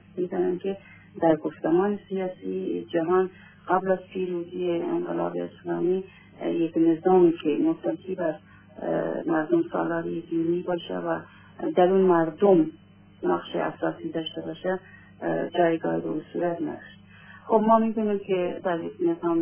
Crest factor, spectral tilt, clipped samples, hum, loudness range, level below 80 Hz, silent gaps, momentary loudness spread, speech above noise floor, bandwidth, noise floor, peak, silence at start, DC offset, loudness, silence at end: 18 dB; -11 dB/octave; under 0.1%; none; 4 LU; -68 dBFS; none; 12 LU; 24 dB; 3.5 kHz; -49 dBFS; -6 dBFS; 0.15 s; under 0.1%; -26 LUFS; 0 s